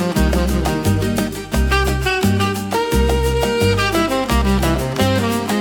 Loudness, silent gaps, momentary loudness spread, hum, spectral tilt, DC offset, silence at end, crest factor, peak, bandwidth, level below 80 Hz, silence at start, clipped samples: -17 LUFS; none; 3 LU; none; -5.5 dB/octave; under 0.1%; 0 s; 14 dB; -4 dBFS; 18 kHz; -24 dBFS; 0 s; under 0.1%